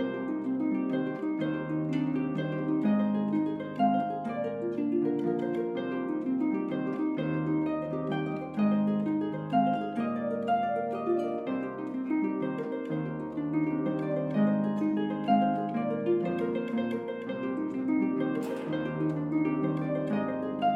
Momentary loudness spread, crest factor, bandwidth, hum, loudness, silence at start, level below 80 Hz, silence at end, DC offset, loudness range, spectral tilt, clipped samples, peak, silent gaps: 6 LU; 16 dB; 7.6 kHz; none; -30 LUFS; 0 s; -68 dBFS; 0 s; under 0.1%; 2 LU; -9 dB/octave; under 0.1%; -12 dBFS; none